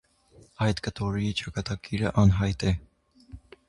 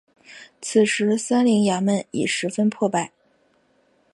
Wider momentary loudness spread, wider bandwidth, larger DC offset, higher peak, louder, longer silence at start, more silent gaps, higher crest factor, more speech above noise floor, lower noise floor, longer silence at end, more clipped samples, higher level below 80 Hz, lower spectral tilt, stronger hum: first, 10 LU vs 6 LU; about the same, 11 kHz vs 11.5 kHz; neither; about the same, -8 dBFS vs -6 dBFS; second, -27 LUFS vs -21 LUFS; first, 0.6 s vs 0.3 s; neither; about the same, 20 dB vs 16 dB; second, 32 dB vs 42 dB; second, -57 dBFS vs -62 dBFS; second, 0.3 s vs 1.05 s; neither; first, -40 dBFS vs -70 dBFS; first, -6.5 dB/octave vs -4.5 dB/octave; neither